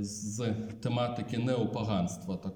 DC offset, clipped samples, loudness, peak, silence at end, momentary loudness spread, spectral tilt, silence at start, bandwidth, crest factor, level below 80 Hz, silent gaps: under 0.1%; under 0.1%; -33 LUFS; -18 dBFS; 0 s; 5 LU; -6 dB/octave; 0 s; 17 kHz; 14 dB; -62 dBFS; none